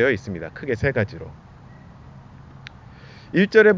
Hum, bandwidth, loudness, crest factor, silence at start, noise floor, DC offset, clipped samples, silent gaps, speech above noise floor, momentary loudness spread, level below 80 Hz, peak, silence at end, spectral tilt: none; 7.6 kHz; -22 LUFS; 22 dB; 0 s; -44 dBFS; under 0.1%; under 0.1%; none; 25 dB; 25 LU; -46 dBFS; -2 dBFS; 0 s; -7 dB/octave